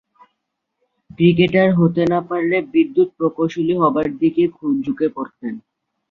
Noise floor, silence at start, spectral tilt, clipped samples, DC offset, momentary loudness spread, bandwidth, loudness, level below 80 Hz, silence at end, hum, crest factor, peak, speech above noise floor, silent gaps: -76 dBFS; 1.2 s; -8.5 dB/octave; under 0.1%; under 0.1%; 11 LU; 6.4 kHz; -18 LUFS; -56 dBFS; 0.55 s; none; 16 dB; -2 dBFS; 59 dB; none